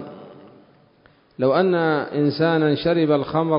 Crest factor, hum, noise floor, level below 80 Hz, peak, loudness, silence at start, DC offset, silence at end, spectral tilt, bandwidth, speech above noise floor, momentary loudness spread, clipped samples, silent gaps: 14 dB; none; -56 dBFS; -58 dBFS; -6 dBFS; -20 LUFS; 0 s; under 0.1%; 0 s; -11.5 dB/octave; 5.4 kHz; 37 dB; 4 LU; under 0.1%; none